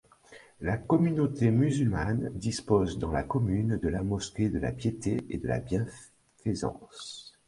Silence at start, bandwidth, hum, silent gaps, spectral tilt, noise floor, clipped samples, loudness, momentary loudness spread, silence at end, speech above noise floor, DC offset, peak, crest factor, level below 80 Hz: 0.3 s; 11.5 kHz; none; none; -7 dB/octave; -55 dBFS; under 0.1%; -30 LUFS; 11 LU; 0.2 s; 26 dB; under 0.1%; -10 dBFS; 18 dB; -46 dBFS